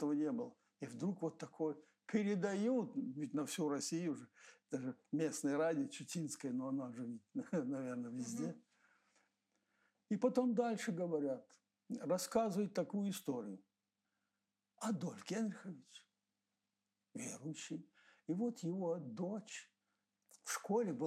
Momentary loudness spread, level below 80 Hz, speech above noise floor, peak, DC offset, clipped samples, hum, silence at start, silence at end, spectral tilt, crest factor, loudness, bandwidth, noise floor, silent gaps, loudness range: 14 LU; -88 dBFS; over 49 dB; -24 dBFS; under 0.1%; under 0.1%; none; 0 s; 0 s; -5.5 dB/octave; 18 dB; -42 LUFS; 15 kHz; under -90 dBFS; none; 7 LU